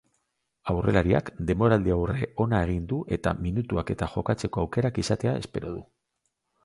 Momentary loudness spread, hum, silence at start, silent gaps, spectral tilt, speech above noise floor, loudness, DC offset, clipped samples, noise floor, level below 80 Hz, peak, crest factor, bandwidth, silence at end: 9 LU; none; 0.65 s; none; -7 dB/octave; 53 dB; -27 LUFS; under 0.1%; under 0.1%; -78 dBFS; -42 dBFS; -6 dBFS; 20 dB; 11.5 kHz; 0.8 s